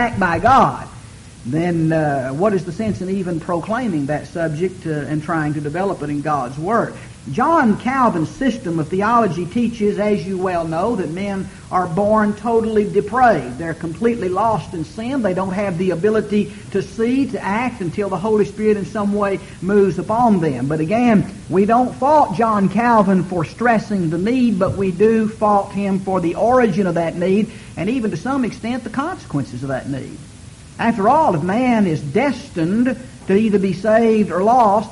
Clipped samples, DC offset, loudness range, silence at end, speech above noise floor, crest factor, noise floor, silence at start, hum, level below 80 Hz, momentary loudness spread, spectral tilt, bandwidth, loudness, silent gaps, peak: under 0.1%; under 0.1%; 5 LU; 0 s; 21 dB; 16 dB; -38 dBFS; 0 s; none; -44 dBFS; 10 LU; -7 dB/octave; 11.5 kHz; -18 LUFS; none; -2 dBFS